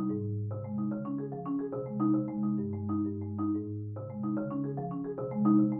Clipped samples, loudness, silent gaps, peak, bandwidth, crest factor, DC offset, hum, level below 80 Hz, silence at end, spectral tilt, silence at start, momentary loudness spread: under 0.1%; -33 LUFS; none; -14 dBFS; 2.2 kHz; 18 dB; under 0.1%; none; -68 dBFS; 0 s; -13 dB/octave; 0 s; 7 LU